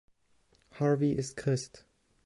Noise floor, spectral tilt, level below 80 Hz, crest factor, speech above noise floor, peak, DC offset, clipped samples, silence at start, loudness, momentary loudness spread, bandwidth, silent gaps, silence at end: -69 dBFS; -6.5 dB/octave; -62 dBFS; 16 dB; 39 dB; -18 dBFS; under 0.1%; under 0.1%; 0.75 s; -31 LUFS; 7 LU; 11.5 kHz; none; 0.45 s